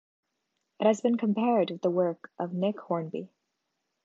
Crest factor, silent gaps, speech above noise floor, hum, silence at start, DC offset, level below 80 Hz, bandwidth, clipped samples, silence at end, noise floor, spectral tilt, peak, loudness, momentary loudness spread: 20 dB; none; 54 dB; none; 0.8 s; under 0.1%; -82 dBFS; 7.6 kHz; under 0.1%; 0.8 s; -81 dBFS; -7 dB/octave; -10 dBFS; -28 LUFS; 10 LU